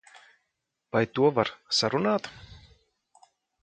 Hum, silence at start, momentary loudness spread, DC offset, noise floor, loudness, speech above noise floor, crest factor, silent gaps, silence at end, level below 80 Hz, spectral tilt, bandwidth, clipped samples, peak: none; 0.95 s; 7 LU; under 0.1%; -81 dBFS; -26 LUFS; 55 dB; 22 dB; none; 1.05 s; -62 dBFS; -4.5 dB/octave; 9.2 kHz; under 0.1%; -8 dBFS